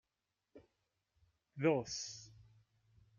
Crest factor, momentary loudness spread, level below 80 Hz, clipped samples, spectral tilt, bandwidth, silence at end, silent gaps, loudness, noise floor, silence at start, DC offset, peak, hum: 24 dB; 23 LU; -76 dBFS; under 0.1%; -4.5 dB/octave; 7.4 kHz; 0.75 s; none; -38 LUFS; -89 dBFS; 0.55 s; under 0.1%; -20 dBFS; none